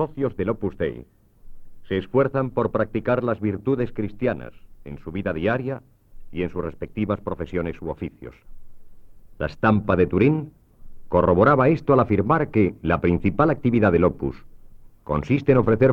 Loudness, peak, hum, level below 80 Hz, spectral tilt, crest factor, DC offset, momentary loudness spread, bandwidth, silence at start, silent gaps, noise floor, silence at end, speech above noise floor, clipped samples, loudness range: -22 LUFS; -6 dBFS; none; -42 dBFS; -10 dB/octave; 18 dB; under 0.1%; 15 LU; 6.6 kHz; 0 s; none; -44 dBFS; 0 s; 23 dB; under 0.1%; 9 LU